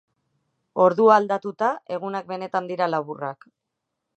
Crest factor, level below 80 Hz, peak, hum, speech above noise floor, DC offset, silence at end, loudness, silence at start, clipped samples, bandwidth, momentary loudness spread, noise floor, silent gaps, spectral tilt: 20 dB; -80 dBFS; -2 dBFS; none; 59 dB; under 0.1%; 0.85 s; -22 LUFS; 0.75 s; under 0.1%; 8.2 kHz; 15 LU; -81 dBFS; none; -6.5 dB/octave